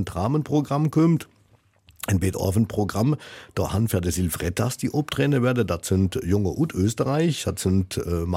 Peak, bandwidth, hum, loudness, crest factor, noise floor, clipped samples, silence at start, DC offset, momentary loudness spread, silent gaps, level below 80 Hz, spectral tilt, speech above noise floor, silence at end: -8 dBFS; 16.5 kHz; none; -24 LUFS; 14 dB; -60 dBFS; under 0.1%; 0 s; under 0.1%; 5 LU; none; -44 dBFS; -6 dB/octave; 37 dB; 0 s